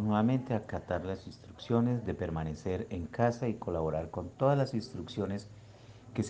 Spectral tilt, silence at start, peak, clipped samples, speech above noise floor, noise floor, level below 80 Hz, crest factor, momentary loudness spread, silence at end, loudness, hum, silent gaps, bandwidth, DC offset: -7.5 dB/octave; 0 s; -12 dBFS; under 0.1%; 20 dB; -53 dBFS; -54 dBFS; 20 dB; 13 LU; 0 s; -34 LUFS; none; none; 9 kHz; under 0.1%